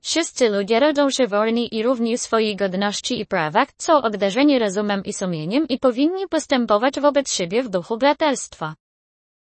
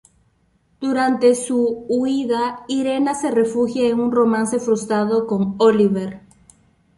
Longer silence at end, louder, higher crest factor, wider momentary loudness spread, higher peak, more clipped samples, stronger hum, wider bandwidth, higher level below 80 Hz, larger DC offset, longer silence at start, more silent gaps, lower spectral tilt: second, 0.65 s vs 0.8 s; about the same, -20 LUFS vs -19 LUFS; about the same, 16 dB vs 16 dB; about the same, 7 LU vs 6 LU; about the same, -2 dBFS vs -4 dBFS; neither; neither; second, 8.8 kHz vs 11.5 kHz; about the same, -60 dBFS vs -58 dBFS; neither; second, 0.05 s vs 0.8 s; neither; second, -4 dB/octave vs -5.5 dB/octave